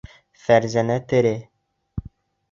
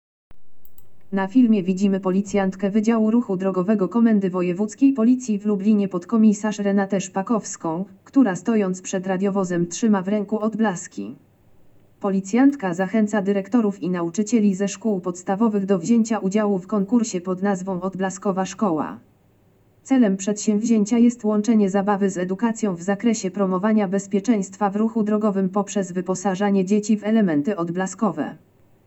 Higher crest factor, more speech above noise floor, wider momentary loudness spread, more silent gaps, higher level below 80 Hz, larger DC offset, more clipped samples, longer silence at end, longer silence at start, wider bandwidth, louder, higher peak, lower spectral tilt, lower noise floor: first, 20 dB vs 14 dB; second, 28 dB vs 37 dB; first, 18 LU vs 7 LU; neither; first, -46 dBFS vs -66 dBFS; neither; neither; about the same, 0.5 s vs 0.5 s; first, 0.5 s vs 0.3 s; about the same, 7.6 kHz vs 8.2 kHz; about the same, -20 LUFS vs -21 LUFS; first, -2 dBFS vs -6 dBFS; about the same, -6.5 dB/octave vs -6.5 dB/octave; second, -47 dBFS vs -57 dBFS